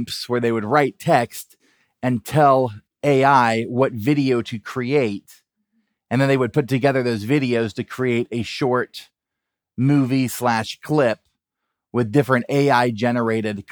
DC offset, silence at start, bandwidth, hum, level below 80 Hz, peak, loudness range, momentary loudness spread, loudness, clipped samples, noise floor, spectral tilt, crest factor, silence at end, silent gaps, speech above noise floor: under 0.1%; 0 s; over 20 kHz; none; -64 dBFS; -2 dBFS; 3 LU; 10 LU; -20 LUFS; under 0.1%; -83 dBFS; -6.5 dB/octave; 18 dB; 0.1 s; none; 64 dB